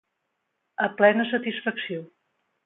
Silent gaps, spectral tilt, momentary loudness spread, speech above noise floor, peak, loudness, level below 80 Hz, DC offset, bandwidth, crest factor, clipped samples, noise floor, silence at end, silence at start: none; -9 dB/octave; 15 LU; 54 dB; -4 dBFS; -24 LUFS; -74 dBFS; under 0.1%; 4 kHz; 22 dB; under 0.1%; -78 dBFS; 0.6 s; 0.8 s